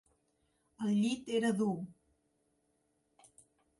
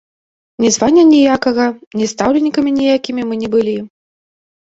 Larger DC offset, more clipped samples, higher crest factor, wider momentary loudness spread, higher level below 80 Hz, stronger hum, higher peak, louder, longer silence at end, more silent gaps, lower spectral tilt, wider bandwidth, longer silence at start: neither; neither; about the same, 16 dB vs 12 dB; about the same, 10 LU vs 11 LU; second, -78 dBFS vs -50 dBFS; neither; second, -22 dBFS vs -2 dBFS; second, -34 LUFS vs -13 LUFS; first, 1.9 s vs 0.8 s; second, none vs 1.87-1.91 s; first, -6 dB/octave vs -4 dB/octave; first, 11.5 kHz vs 8 kHz; first, 0.8 s vs 0.6 s